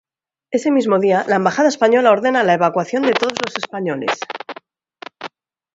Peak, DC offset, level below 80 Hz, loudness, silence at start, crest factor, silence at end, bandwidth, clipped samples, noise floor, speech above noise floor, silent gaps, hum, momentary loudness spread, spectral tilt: 0 dBFS; under 0.1%; -68 dBFS; -16 LUFS; 0.5 s; 18 dB; 0.5 s; 8 kHz; under 0.1%; -49 dBFS; 33 dB; none; none; 19 LU; -5 dB/octave